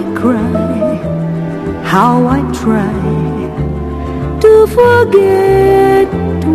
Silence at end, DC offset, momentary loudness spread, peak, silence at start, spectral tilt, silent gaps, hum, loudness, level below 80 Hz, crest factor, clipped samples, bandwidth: 0 s; under 0.1%; 11 LU; 0 dBFS; 0 s; -7.5 dB/octave; none; none; -11 LUFS; -28 dBFS; 10 dB; 0.3%; 14.5 kHz